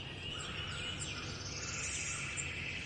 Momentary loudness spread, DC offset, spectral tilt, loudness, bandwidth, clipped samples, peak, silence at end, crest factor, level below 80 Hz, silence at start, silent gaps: 4 LU; under 0.1%; -2 dB/octave; -39 LUFS; 11.5 kHz; under 0.1%; -26 dBFS; 0 s; 16 dB; -56 dBFS; 0 s; none